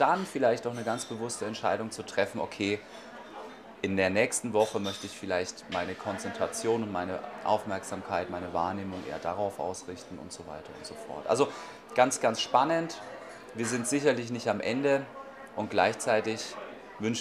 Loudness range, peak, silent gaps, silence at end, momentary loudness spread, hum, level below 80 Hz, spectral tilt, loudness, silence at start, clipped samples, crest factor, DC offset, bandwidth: 5 LU; -8 dBFS; none; 0 s; 16 LU; none; -68 dBFS; -4 dB/octave; -30 LUFS; 0 s; under 0.1%; 24 dB; under 0.1%; 15.5 kHz